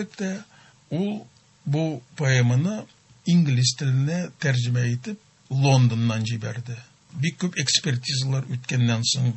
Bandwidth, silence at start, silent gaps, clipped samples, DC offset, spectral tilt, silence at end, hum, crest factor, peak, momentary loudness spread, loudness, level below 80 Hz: 8.4 kHz; 0 s; none; under 0.1%; under 0.1%; -5 dB/octave; 0 s; none; 20 dB; -4 dBFS; 15 LU; -23 LUFS; -60 dBFS